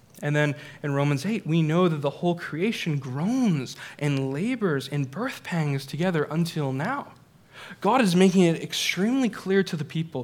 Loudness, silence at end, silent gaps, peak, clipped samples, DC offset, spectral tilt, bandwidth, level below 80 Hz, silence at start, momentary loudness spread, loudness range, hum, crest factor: -25 LUFS; 0 s; none; -6 dBFS; under 0.1%; under 0.1%; -6 dB/octave; 16.5 kHz; -70 dBFS; 0.2 s; 9 LU; 4 LU; none; 20 dB